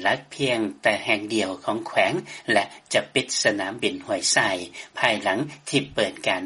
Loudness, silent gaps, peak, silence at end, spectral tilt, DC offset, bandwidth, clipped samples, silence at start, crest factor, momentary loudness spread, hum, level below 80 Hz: -23 LUFS; none; -4 dBFS; 0 s; -2.5 dB/octave; under 0.1%; 11.5 kHz; under 0.1%; 0 s; 20 dB; 6 LU; none; -64 dBFS